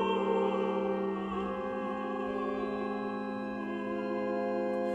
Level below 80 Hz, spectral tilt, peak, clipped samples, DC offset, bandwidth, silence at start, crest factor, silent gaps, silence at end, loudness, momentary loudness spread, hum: -62 dBFS; -7.5 dB/octave; -18 dBFS; under 0.1%; under 0.1%; 8.4 kHz; 0 s; 14 dB; none; 0 s; -34 LUFS; 6 LU; none